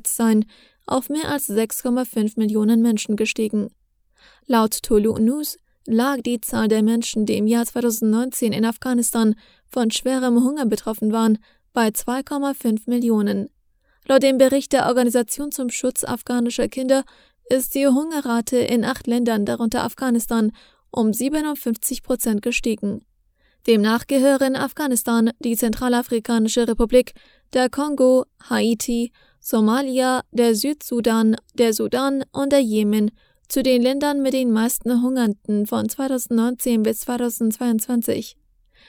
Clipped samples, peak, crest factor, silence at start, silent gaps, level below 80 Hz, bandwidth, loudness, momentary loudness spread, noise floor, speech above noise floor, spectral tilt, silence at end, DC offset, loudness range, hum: under 0.1%; -2 dBFS; 20 dB; 0.05 s; none; -46 dBFS; over 20 kHz; -20 LUFS; 7 LU; -62 dBFS; 42 dB; -4.5 dB/octave; 0.55 s; under 0.1%; 2 LU; none